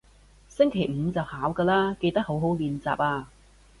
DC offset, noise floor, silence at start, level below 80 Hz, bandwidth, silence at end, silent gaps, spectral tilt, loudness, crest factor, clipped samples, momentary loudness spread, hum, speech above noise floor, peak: under 0.1%; -55 dBFS; 0.6 s; -52 dBFS; 11.5 kHz; 0.55 s; none; -7.5 dB/octave; -26 LUFS; 18 dB; under 0.1%; 6 LU; 50 Hz at -50 dBFS; 29 dB; -8 dBFS